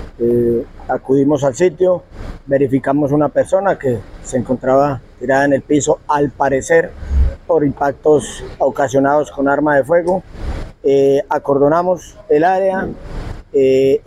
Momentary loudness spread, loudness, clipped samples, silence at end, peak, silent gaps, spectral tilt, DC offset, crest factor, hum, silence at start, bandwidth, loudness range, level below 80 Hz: 10 LU; -15 LUFS; under 0.1%; 0.05 s; -2 dBFS; none; -6.5 dB/octave; under 0.1%; 14 dB; none; 0 s; 13 kHz; 1 LU; -30 dBFS